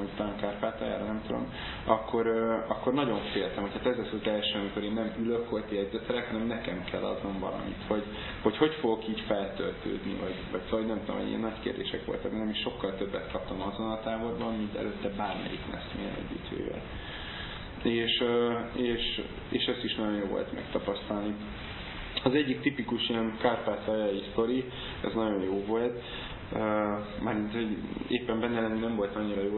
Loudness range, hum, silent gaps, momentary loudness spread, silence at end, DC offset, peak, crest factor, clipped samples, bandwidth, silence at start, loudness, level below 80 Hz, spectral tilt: 4 LU; none; none; 9 LU; 0 s; under 0.1%; -8 dBFS; 24 dB; under 0.1%; 4.3 kHz; 0 s; -32 LUFS; -50 dBFS; -9.5 dB/octave